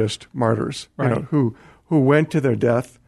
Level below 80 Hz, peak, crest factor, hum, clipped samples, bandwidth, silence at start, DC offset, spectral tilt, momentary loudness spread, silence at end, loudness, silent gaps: -54 dBFS; -4 dBFS; 16 dB; none; under 0.1%; 12.5 kHz; 0 s; under 0.1%; -7 dB/octave; 8 LU; 0.2 s; -20 LUFS; none